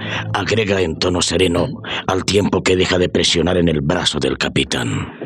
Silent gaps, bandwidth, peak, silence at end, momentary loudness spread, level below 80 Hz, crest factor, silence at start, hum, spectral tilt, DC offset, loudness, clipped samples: none; 13 kHz; -2 dBFS; 0 s; 6 LU; -40 dBFS; 14 dB; 0 s; none; -4.5 dB/octave; under 0.1%; -17 LUFS; under 0.1%